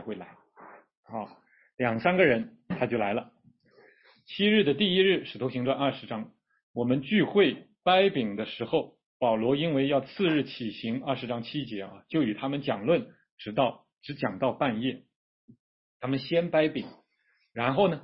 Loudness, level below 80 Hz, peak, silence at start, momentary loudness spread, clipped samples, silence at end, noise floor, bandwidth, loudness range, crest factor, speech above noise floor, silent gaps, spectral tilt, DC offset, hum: -28 LUFS; -66 dBFS; -8 dBFS; 0 s; 16 LU; under 0.1%; 0 s; -72 dBFS; 5.8 kHz; 5 LU; 20 dB; 45 dB; 0.97-1.03 s, 1.74-1.78 s, 6.63-6.74 s, 9.06-9.20 s, 13.32-13.38 s, 15.16-15.48 s, 15.60-16.00 s; -10 dB/octave; under 0.1%; none